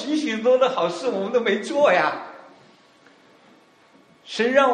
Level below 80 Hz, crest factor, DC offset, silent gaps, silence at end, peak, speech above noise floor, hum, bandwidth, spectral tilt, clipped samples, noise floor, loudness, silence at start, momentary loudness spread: -72 dBFS; 20 dB; under 0.1%; none; 0 s; -2 dBFS; 35 dB; none; 10 kHz; -4 dB/octave; under 0.1%; -55 dBFS; -21 LUFS; 0 s; 11 LU